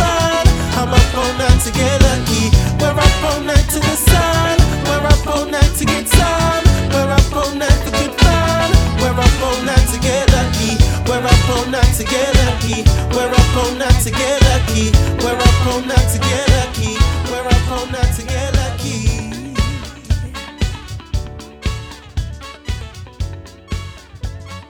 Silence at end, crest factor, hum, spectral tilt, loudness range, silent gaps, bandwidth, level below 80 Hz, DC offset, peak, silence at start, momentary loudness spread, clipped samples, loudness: 0.05 s; 14 dB; none; -4.5 dB/octave; 10 LU; none; 19 kHz; -18 dBFS; under 0.1%; 0 dBFS; 0 s; 14 LU; under 0.1%; -15 LUFS